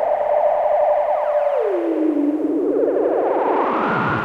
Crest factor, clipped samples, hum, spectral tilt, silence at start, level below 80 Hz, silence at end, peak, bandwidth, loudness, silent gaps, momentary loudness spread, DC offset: 12 dB; under 0.1%; none; -8.5 dB/octave; 0 s; -56 dBFS; 0 s; -6 dBFS; 6 kHz; -18 LUFS; none; 2 LU; under 0.1%